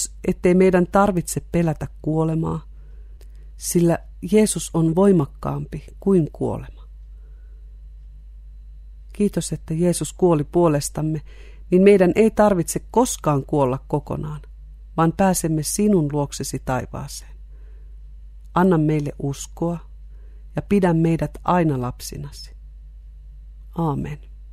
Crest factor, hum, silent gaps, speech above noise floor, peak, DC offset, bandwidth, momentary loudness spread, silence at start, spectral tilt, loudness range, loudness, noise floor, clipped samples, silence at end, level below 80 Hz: 20 dB; none; none; 20 dB; -2 dBFS; under 0.1%; 15.5 kHz; 16 LU; 0 s; -6.5 dB/octave; 8 LU; -20 LUFS; -40 dBFS; under 0.1%; 0 s; -38 dBFS